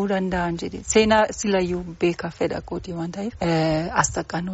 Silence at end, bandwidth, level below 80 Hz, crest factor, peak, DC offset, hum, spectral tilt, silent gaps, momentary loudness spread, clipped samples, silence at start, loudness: 0 s; 8 kHz; -44 dBFS; 18 dB; -4 dBFS; under 0.1%; none; -4.5 dB/octave; none; 11 LU; under 0.1%; 0 s; -23 LUFS